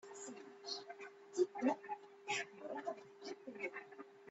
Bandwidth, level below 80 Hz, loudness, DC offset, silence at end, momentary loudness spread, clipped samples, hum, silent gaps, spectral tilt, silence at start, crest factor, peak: 8.2 kHz; under -90 dBFS; -45 LUFS; under 0.1%; 0 s; 13 LU; under 0.1%; none; none; -2.5 dB/octave; 0.05 s; 22 dB; -24 dBFS